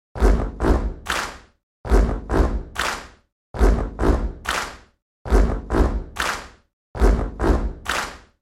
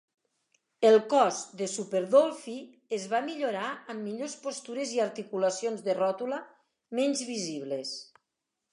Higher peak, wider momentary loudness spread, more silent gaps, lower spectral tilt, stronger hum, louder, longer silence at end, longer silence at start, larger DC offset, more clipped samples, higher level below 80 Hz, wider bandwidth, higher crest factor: first, -2 dBFS vs -10 dBFS; second, 11 LU vs 14 LU; first, 1.63-1.84 s, 3.32-3.54 s, 5.02-5.25 s, 6.73-6.94 s vs none; first, -5.5 dB/octave vs -3.5 dB/octave; neither; first, -23 LUFS vs -29 LUFS; second, 0.25 s vs 0.7 s; second, 0.15 s vs 0.8 s; neither; neither; first, -22 dBFS vs -86 dBFS; first, 13.5 kHz vs 11.5 kHz; about the same, 18 dB vs 20 dB